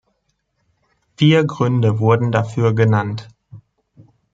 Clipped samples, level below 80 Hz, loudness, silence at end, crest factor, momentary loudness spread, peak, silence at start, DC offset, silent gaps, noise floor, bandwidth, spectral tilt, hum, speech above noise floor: under 0.1%; -56 dBFS; -16 LUFS; 0.75 s; 16 dB; 6 LU; -2 dBFS; 1.2 s; under 0.1%; none; -69 dBFS; 7.8 kHz; -7.5 dB/octave; none; 54 dB